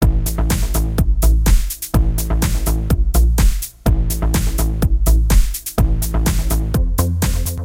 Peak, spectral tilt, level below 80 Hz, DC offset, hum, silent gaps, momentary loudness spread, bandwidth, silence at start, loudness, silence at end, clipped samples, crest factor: -2 dBFS; -5.5 dB/octave; -16 dBFS; under 0.1%; none; none; 4 LU; 17 kHz; 0 s; -18 LUFS; 0 s; under 0.1%; 12 dB